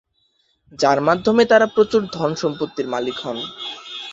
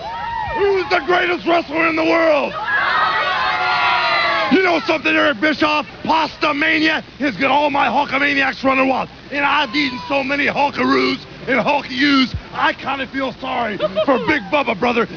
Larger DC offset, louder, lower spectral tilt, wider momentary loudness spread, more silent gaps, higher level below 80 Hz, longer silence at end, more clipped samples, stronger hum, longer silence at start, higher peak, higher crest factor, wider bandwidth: neither; second, -19 LUFS vs -16 LUFS; about the same, -5 dB/octave vs -5 dB/octave; first, 14 LU vs 6 LU; neither; second, -58 dBFS vs -46 dBFS; about the same, 0 s vs 0 s; neither; neither; first, 0.75 s vs 0 s; about the same, -2 dBFS vs -4 dBFS; about the same, 18 dB vs 14 dB; first, 7.8 kHz vs 5.4 kHz